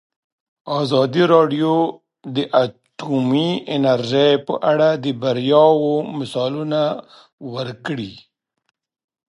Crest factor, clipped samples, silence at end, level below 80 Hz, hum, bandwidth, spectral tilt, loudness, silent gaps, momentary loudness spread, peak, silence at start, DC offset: 18 dB; under 0.1%; 1.1 s; -66 dBFS; none; 11.5 kHz; -7 dB/octave; -18 LUFS; 7.33-7.38 s; 14 LU; 0 dBFS; 0.65 s; under 0.1%